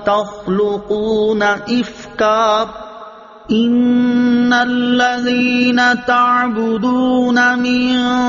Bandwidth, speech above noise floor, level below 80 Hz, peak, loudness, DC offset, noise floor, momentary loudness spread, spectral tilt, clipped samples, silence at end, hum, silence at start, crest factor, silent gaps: 7.2 kHz; 22 dB; -48 dBFS; -2 dBFS; -14 LUFS; under 0.1%; -36 dBFS; 7 LU; -2.5 dB/octave; under 0.1%; 0 s; none; 0 s; 12 dB; none